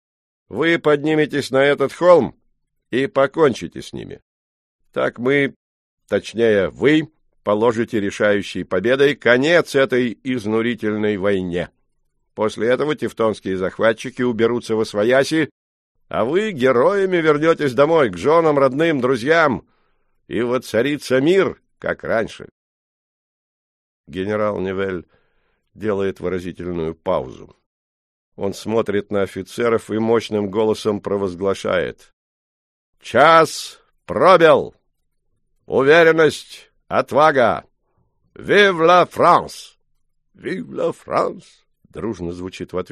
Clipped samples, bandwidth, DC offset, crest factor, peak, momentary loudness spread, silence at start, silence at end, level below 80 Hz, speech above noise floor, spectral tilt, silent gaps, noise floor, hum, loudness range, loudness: under 0.1%; 13 kHz; under 0.1%; 18 dB; 0 dBFS; 15 LU; 0.5 s; 0.1 s; -54 dBFS; 50 dB; -5.5 dB/octave; 4.22-4.79 s, 5.56-5.98 s, 15.51-15.95 s, 22.51-24.04 s, 27.66-28.32 s, 32.13-32.93 s; -67 dBFS; none; 9 LU; -18 LUFS